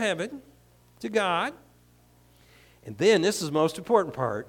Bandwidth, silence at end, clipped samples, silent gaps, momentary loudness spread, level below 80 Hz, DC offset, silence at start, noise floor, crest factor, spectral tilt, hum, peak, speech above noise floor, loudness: 18 kHz; 0.05 s; under 0.1%; none; 19 LU; -64 dBFS; under 0.1%; 0 s; -59 dBFS; 20 dB; -4.5 dB/octave; 60 Hz at -60 dBFS; -8 dBFS; 33 dB; -26 LUFS